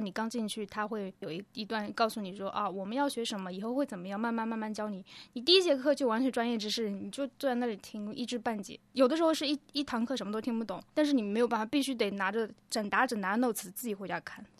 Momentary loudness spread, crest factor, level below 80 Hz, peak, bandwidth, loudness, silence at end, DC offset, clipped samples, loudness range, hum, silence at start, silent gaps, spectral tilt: 10 LU; 22 dB; -74 dBFS; -10 dBFS; 14 kHz; -32 LUFS; 0.15 s; under 0.1%; under 0.1%; 5 LU; none; 0 s; none; -4 dB/octave